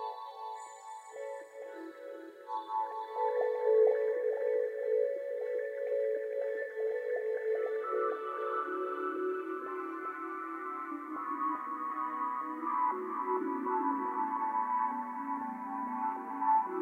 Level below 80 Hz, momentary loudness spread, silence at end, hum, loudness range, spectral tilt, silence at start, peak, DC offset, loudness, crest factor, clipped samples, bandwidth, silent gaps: under -90 dBFS; 12 LU; 0 s; none; 6 LU; -5 dB/octave; 0 s; -18 dBFS; under 0.1%; -34 LUFS; 18 dB; under 0.1%; 9.4 kHz; none